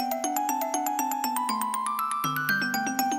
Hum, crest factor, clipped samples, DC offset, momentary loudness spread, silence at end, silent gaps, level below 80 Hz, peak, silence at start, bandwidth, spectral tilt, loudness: none; 18 dB; under 0.1%; under 0.1%; 2 LU; 0 s; none; -72 dBFS; -10 dBFS; 0 s; 16.5 kHz; -2.5 dB/octave; -27 LUFS